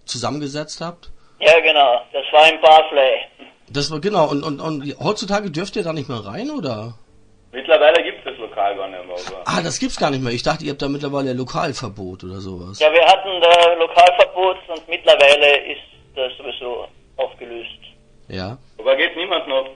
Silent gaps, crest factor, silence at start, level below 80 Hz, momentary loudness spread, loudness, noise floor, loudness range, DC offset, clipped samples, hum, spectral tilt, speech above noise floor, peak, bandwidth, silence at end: none; 18 dB; 0.1 s; -48 dBFS; 20 LU; -16 LUFS; -51 dBFS; 10 LU; under 0.1%; under 0.1%; none; -4 dB/octave; 34 dB; 0 dBFS; 10.5 kHz; 0 s